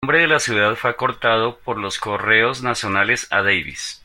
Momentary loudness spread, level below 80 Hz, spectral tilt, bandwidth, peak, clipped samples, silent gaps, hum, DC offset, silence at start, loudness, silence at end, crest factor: 9 LU; -52 dBFS; -3 dB/octave; 16.5 kHz; -2 dBFS; under 0.1%; none; none; under 0.1%; 0 s; -18 LUFS; 0.1 s; 18 dB